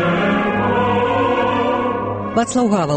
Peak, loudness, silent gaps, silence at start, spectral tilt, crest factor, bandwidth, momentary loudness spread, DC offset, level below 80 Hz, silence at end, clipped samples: -4 dBFS; -17 LUFS; none; 0 s; -5.5 dB/octave; 12 dB; 8.8 kHz; 4 LU; under 0.1%; -44 dBFS; 0 s; under 0.1%